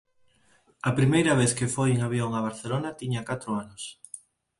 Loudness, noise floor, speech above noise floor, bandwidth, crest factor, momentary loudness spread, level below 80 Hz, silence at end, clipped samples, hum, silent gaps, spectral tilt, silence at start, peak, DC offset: -26 LUFS; -63 dBFS; 38 dB; 11.5 kHz; 18 dB; 17 LU; -58 dBFS; 0.4 s; under 0.1%; none; none; -5.5 dB/octave; 0.85 s; -10 dBFS; under 0.1%